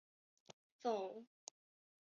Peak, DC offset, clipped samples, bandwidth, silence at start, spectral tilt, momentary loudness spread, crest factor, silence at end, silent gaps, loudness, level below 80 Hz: -28 dBFS; under 0.1%; under 0.1%; 7.2 kHz; 0.8 s; -3.5 dB/octave; 23 LU; 20 dB; 0.9 s; none; -45 LUFS; under -90 dBFS